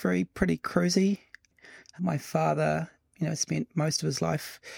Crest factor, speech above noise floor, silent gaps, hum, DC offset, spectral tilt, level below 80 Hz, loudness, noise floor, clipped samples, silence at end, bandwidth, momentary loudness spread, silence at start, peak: 20 dB; 26 dB; none; none; under 0.1%; -5 dB/octave; -54 dBFS; -29 LUFS; -54 dBFS; under 0.1%; 0 s; 17.5 kHz; 9 LU; 0 s; -10 dBFS